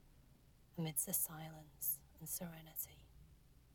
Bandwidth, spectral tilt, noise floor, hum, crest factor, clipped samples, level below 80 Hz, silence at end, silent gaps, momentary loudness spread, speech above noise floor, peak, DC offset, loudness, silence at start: 19.5 kHz; -3.5 dB/octave; -67 dBFS; none; 24 dB; under 0.1%; -68 dBFS; 0.05 s; none; 14 LU; 23 dB; -24 dBFS; under 0.1%; -42 LUFS; 0.05 s